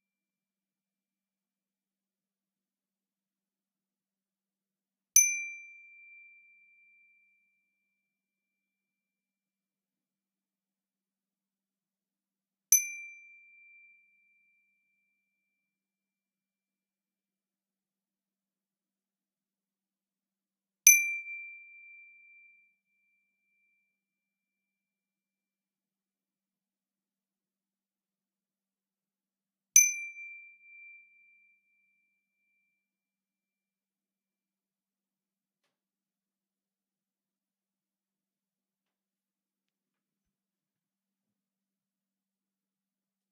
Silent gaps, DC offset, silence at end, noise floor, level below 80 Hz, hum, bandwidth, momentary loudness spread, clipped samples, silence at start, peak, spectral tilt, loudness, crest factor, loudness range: none; under 0.1%; 12.95 s; under -90 dBFS; under -90 dBFS; none; 6.2 kHz; 26 LU; under 0.1%; 5.15 s; -4 dBFS; 4.5 dB/octave; -24 LUFS; 34 dB; 5 LU